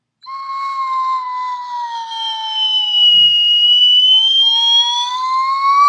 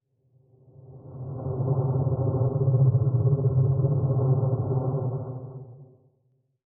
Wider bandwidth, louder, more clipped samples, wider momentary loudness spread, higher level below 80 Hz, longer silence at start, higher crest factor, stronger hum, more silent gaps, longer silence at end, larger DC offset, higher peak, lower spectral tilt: first, 9.4 kHz vs 1.5 kHz; first, -10 LUFS vs -25 LUFS; neither; about the same, 16 LU vs 16 LU; second, -80 dBFS vs -52 dBFS; second, 0.25 s vs 0.85 s; about the same, 12 dB vs 14 dB; neither; neither; second, 0 s vs 0.8 s; neither; first, -2 dBFS vs -12 dBFS; second, 3.5 dB/octave vs -14 dB/octave